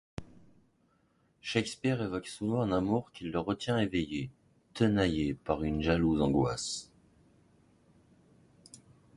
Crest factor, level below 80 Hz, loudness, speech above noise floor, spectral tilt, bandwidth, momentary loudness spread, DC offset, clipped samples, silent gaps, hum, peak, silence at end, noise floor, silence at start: 20 dB; -52 dBFS; -32 LUFS; 40 dB; -6 dB/octave; 11.5 kHz; 12 LU; under 0.1%; under 0.1%; none; none; -12 dBFS; 0.4 s; -71 dBFS; 0.2 s